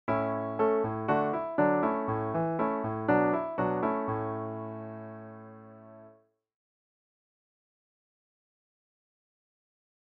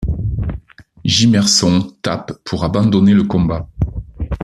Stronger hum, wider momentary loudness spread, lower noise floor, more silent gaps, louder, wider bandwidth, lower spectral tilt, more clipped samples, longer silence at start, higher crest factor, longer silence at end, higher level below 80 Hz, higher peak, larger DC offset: neither; first, 18 LU vs 13 LU; first, -62 dBFS vs -36 dBFS; neither; second, -30 LUFS vs -15 LUFS; second, 5 kHz vs 12.5 kHz; first, -7.5 dB/octave vs -5 dB/octave; neither; about the same, 0.05 s vs 0 s; first, 20 dB vs 14 dB; first, 3.95 s vs 0 s; second, -66 dBFS vs -30 dBFS; second, -12 dBFS vs 0 dBFS; neither